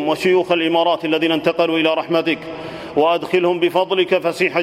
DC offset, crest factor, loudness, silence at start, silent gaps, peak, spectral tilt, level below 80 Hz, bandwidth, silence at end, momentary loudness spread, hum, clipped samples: under 0.1%; 16 dB; -17 LUFS; 0 s; none; -2 dBFS; -5.5 dB/octave; -60 dBFS; 14 kHz; 0 s; 5 LU; none; under 0.1%